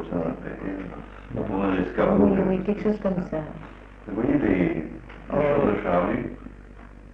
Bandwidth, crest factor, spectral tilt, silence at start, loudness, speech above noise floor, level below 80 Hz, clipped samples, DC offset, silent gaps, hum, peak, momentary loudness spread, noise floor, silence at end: 6 kHz; 18 dB; -9.5 dB/octave; 0 s; -25 LUFS; 20 dB; -42 dBFS; under 0.1%; under 0.1%; none; none; -8 dBFS; 19 LU; -44 dBFS; 0 s